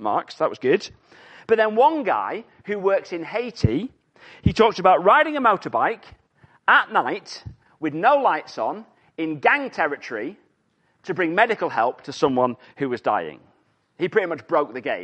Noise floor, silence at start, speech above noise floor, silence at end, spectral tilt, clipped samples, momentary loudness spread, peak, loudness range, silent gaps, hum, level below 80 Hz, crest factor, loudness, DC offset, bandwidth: -66 dBFS; 0 s; 45 dB; 0 s; -6 dB/octave; under 0.1%; 15 LU; -2 dBFS; 5 LU; none; none; -48 dBFS; 20 dB; -21 LUFS; under 0.1%; 8.8 kHz